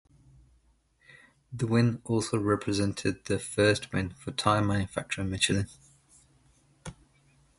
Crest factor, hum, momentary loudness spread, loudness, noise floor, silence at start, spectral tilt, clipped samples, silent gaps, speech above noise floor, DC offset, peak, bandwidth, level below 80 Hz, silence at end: 24 dB; none; 15 LU; -28 LUFS; -66 dBFS; 1.5 s; -5 dB/octave; under 0.1%; none; 38 dB; under 0.1%; -8 dBFS; 11.5 kHz; -52 dBFS; 0.65 s